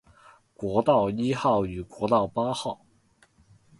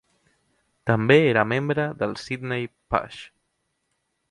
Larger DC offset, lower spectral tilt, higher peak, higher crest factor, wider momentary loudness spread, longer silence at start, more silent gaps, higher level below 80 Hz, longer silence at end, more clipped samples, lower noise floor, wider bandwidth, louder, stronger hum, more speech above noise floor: neither; about the same, -6.5 dB/octave vs -7 dB/octave; second, -8 dBFS vs -2 dBFS; about the same, 20 dB vs 22 dB; about the same, 12 LU vs 14 LU; second, 0.6 s vs 0.85 s; neither; about the same, -54 dBFS vs -54 dBFS; about the same, 1.05 s vs 1.05 s; neither; second, -63 dBFS vs -75 dBFS; about the same, 11.5 kHz vs 11 kHz; second, -26 LUFS vs -23 LUFS; neither; second, 38 dB vs 52 dB